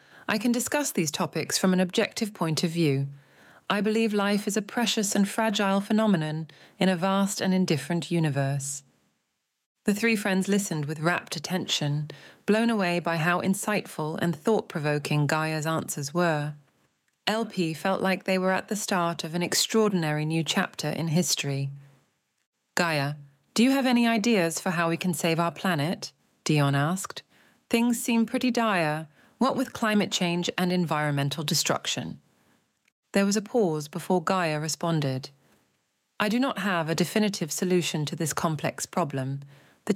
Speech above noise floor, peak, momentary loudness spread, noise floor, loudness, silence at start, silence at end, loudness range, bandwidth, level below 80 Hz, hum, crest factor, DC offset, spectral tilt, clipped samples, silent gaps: 52 dB; -6 dBFS; 8 LU; -78 dBFS; -26 LUFS; 0.3 s; 0 s; 3 LU; 16.5 kHz; -74 dBFS; none; 20 dB; under 0.1%; -4.5 dB/octave; under 0.1%; 9.66-9.75 s, 22.46-22.53 s, 32.92-33.03 s